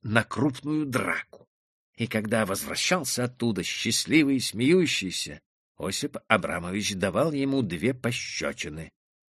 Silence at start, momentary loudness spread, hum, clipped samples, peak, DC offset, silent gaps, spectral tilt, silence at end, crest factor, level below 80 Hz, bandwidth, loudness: 0.05 s; 10 LU; none; under 0.1%; -2 dBFS; under 0.1%; 1.47-1.93 s, 5.46-5.75 s; -4 dB/octave; 0.5 s; 24 dB; -58 dBFS; 13 kHz; -26 LUFS